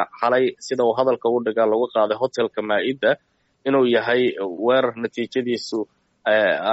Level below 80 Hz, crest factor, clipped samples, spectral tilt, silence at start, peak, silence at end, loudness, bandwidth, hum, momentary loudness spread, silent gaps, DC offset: -68 dBFS; 14 dB; under 0.1%; -2.5 dB/octave; 0 s; -6 dBFS; 0 s; -21 LUFS; 8 kHz; none; 9 LU; none; under 0.1%